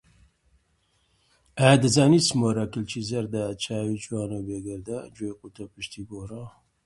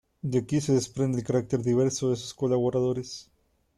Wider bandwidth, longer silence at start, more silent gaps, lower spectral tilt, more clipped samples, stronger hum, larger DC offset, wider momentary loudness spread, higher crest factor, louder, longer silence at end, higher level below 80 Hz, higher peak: about the same, 11.5 kHz vs 12.5 kHz; first, 1.55 s vs 0.25 s; neither; second, -5 dB/octave vs -6.5 dB/octave; neither; neither; neither; first, 21 LU vs 5 LU; first, 24 dB vs 14 dB; first, -24 LUFS vs -27 LUFS; second, 0.35 s vs 0.55 s; about the same, -56 dBFS vs -60 dBFS; first, -2 dBFS vs -12 dBFS